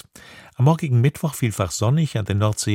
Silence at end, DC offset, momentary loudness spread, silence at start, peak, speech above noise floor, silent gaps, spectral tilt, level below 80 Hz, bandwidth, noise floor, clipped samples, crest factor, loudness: 0 s; under 0.1%; 5 LU; 0.3 s; -4 dBFS; 26 dB; none; -6 dB/octave; -50 dBFS; 16 kHz; -45 dBFS; under 0.1%; 16 dB; -21 LUFS